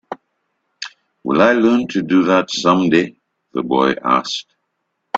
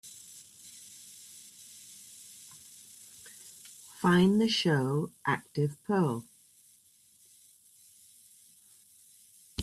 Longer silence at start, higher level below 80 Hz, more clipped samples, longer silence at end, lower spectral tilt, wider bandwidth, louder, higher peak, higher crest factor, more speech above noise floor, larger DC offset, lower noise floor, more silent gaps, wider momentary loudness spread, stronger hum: about the same, 0.1 s vs 0.05 s; first, -58 dBFS vs -68 dBFS; neither; about the same, 0 s vs 0 s; about the same, -5 dB/octave vs -5.5 dB/octave; second, 8 kHz vs 15 kHz; first, -16 LUFS vs -29 LUFS; first, 0 dBFS vs -14 dBFS; about the same, 18 dB vs 20 dB; first, 57 dB vs 35 dB; neither; first, -72 dBFS vs -63 dBFS; neither; second, 18 LU vs 24 LU; neither